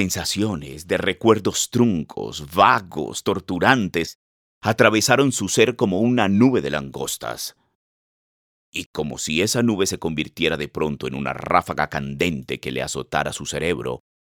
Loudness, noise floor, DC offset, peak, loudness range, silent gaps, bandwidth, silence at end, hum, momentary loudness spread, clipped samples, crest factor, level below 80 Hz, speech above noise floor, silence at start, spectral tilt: -21 LUFS; under -90 dBFS; under 0.1%; 0 dBFS; 6 LU; 4.15-4.61 s, 7.75-8.73 s, 8.86-8.94 s; 20 kHz; 0.25 s; none; 12 LU; under 0.1%; 20 dB; -52 dBFS; over 69 dB; 0 s; -4 dB/octave